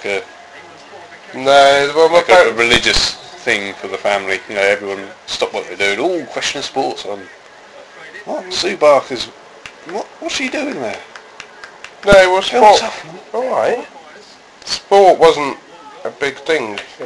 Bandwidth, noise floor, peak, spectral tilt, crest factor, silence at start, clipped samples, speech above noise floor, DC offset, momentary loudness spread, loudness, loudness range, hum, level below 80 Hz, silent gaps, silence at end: 12 kHz; -40 dBFS; 0 dBFS; -2.5 dB/octave; 16 dB; 0 s; 0.1%; 26 dB; under 0.1%; 23 LU; -14 LUFS; 8 LU; none; -40 dBFS; none; 0 s